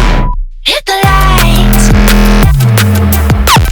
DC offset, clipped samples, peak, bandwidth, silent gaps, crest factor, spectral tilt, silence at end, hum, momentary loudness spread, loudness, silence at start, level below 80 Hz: under 0.1%; 3%; 0 dBFS; over 20 kHz; none; 6 dB; -4.5 dB/octave; 0 s; none; 5 LU; -8 LUFS; 0 s; -10 dBFS